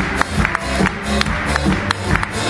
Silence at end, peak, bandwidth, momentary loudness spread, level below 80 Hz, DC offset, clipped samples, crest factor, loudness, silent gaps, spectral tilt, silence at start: 0 s; 0 dBFS; 12 kHz; 1 LU; -28 dBFS; under 0.1%; under 0.1%; 18 dB; -18 LUFS; none; -4.5 dB/octave; 0 s